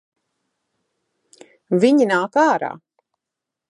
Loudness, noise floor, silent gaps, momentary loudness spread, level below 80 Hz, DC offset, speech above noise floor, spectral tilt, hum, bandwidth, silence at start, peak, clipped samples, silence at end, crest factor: -17 LUFS; -84 dBFS; none; 8 LU; -74 dBFS; under 0.1%; 68 dB; -6 dB/octave; none; 10.5 kHz; 1.7 s; -2 dBFS; under 0.1%; 0.95 s; 18 dB